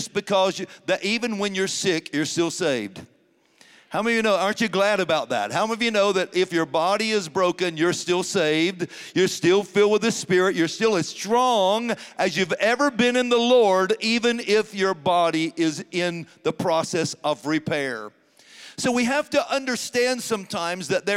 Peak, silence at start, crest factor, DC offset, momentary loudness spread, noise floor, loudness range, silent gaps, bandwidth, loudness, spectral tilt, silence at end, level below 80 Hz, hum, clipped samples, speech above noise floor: -6 dBFS; 0 s; 16 dB; under 0.1%; 7 LU; -61 dBFS; 5 LU; none; 16 kHz; -22 LUFS; -4 dB/octave; 0 s; -68 dBFS; none; under 0.1%; 39 dB